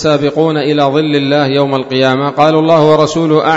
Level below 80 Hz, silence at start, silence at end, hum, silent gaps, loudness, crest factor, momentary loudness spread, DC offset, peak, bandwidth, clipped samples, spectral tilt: -48 dBFS; 0 s; 0 s; none; none; -11 LUFS; 10 dB; 4 LU; under 0.1%; 0 dBFS; 8 kHz; 0.4%; -6 dB/octave